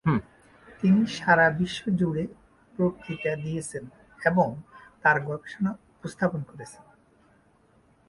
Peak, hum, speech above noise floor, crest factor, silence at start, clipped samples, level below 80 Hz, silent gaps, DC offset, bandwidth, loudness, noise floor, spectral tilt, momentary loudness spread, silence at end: -6 dBFS; none; 36 dB; 22 dB; 0.05 s; under 0.1%; -58 dBFS; none; under 0.1%; 11.5 kHz; -26 LUFS; -62 dBFS; -6.5 dB/octave; 18 LU; 1.35 s